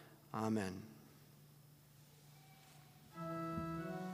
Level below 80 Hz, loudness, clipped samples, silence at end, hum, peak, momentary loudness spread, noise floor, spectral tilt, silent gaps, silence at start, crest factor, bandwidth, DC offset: -74 dBFS; -44 LUFS; under 0.1%; 0 s; none; -26 dBFS; 23 LU; -64 dBFS; -6.5 dB/octave; none; 0 s; 20 dB; 15.5 kHz; under 0.1%